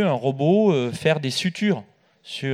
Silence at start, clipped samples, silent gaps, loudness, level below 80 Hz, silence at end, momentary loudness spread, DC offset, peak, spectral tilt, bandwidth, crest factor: 0 s; under 0.1%; none; -22 LUFS; -66 dBFS; 0 s; 10 LU; under 0.1%; -4 dBFS; -6 dB/octave; 14.5 kHz; 18 dB